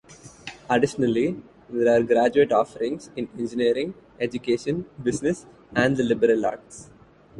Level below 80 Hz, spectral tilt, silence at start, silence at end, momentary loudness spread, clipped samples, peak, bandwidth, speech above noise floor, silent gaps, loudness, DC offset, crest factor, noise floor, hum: -58 dBFS; -6 dB/octave; 0.1 s; 0 s; 16 LU; under 0.1%; -6 dBFS; 11.5 kHz; 20 dB; none; -24 LUFS; under 0.1%; 18 dB; -43 dBFS; none